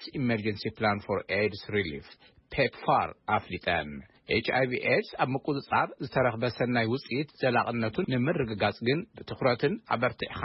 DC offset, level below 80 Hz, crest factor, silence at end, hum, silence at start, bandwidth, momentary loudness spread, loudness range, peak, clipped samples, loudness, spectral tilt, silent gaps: under 0.1%; -58 dBFS; 16 dB; 0 s; none; 0 s; 5.8 kHz; 5 LU; 2 LU; -12 dBFS; under 0.1%; -29 LUFS; -10 dB/octave; none